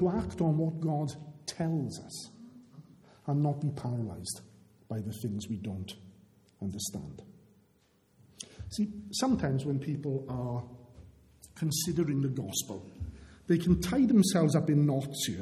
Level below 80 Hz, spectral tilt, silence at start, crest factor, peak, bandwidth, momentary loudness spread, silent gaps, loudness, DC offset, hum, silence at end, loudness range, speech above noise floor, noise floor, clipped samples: -54 dBFS; -6 dB/octave; 0 s; 20 dB; -14 dBFS; 16 kHz; 18 LU; none; -32 LUFS; under 0.1%; none; 0 s; 11 LU; 37 dB; -68 dBFS; under 0.1%